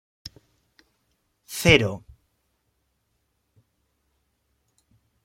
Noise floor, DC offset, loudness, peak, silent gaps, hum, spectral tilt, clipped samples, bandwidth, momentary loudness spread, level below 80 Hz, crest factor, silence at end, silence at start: -73 dBFS; under 0.1%; -20 LUFS; -2 dBFS; none; none; -4.5 dB/octave; under 0.1%; 16.5 kHz; 26 LU; -50 dBFS; 28 dB; 3.25 s; 1.5 s